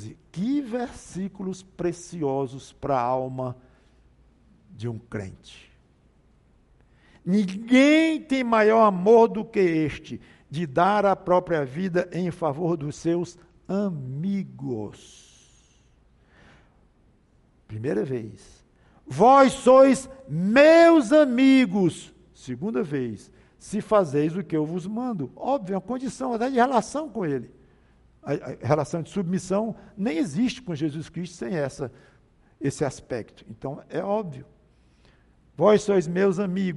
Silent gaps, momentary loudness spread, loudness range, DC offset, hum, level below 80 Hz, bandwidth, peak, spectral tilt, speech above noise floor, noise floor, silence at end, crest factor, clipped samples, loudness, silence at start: none; 18 LU; 17 LU; under 0.1%; none; -58 dBFS; 11.5 kHz; -6 dBFS; -6.5 dB/octave; 38 dB; -60 dBFS; 0 s; 18 dB; under 0.1%; -23 LUFS; 0 s